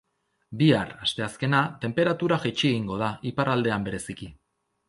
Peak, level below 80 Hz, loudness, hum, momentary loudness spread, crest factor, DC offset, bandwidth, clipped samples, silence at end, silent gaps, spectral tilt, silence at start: -6 dBFS; -56 dBFS; -25 LUFS; none; 13 LU; 20 dB; under 0.1%; 11.5 kHz; under 0.1%; 0.55 s; none; -6 dB/octave; 0.5 s